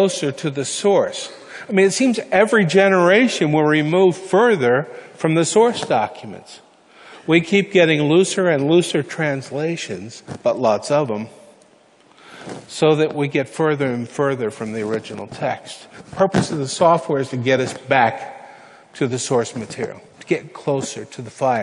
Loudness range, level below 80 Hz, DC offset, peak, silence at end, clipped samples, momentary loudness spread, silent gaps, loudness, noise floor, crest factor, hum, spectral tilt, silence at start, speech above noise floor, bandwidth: 7 LU; -60 dBFS; under 0.1%; -2 dBFS; 0 s; under 0.1%; 17 LU; none; -18 LUFS; -52 dBFS; 18 dB; none; -5 dB/octave; 0 s; 34 dB; 11 kHz